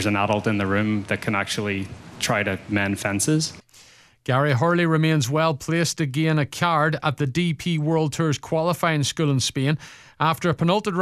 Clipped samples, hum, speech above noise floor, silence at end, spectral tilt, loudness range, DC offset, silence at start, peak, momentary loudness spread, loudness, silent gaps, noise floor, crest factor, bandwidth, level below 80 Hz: under 0.1%; none; 29 dB; 0 s; -5 dB/octave; 3 LU; under 0.1%; 0 s; -4 dBFS; 5 LU; -22 LUFS; none; -51 dBFS; 18 dB; 14.5 kHz; -56 dBFS